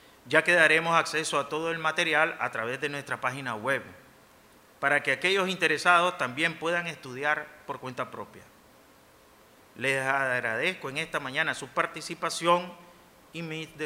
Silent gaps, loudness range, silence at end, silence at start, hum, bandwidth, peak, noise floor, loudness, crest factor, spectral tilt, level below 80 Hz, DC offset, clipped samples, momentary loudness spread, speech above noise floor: none; 7 LU; 0 s; 0.25 s; none; 16 kHz; -6 dBFS; -57 dBFS; -27 LUFS; 24 dB; -3.5 dB/octave; -70 dBFS; under 0.1%; under 0.1%; 14 LU; 29 dB